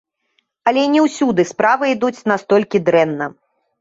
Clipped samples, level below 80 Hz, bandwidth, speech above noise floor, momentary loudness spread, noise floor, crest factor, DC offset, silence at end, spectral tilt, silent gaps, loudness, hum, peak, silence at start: under 0.1%; -62 dBFS; 8 kHz; 51 dB; 6 LU; -66 dBFS; 16 dB; under 0.1%; 0.5 s; -5.5 dB/octave; none; -16 LUFS; none; -2 dBFS; 0.65 s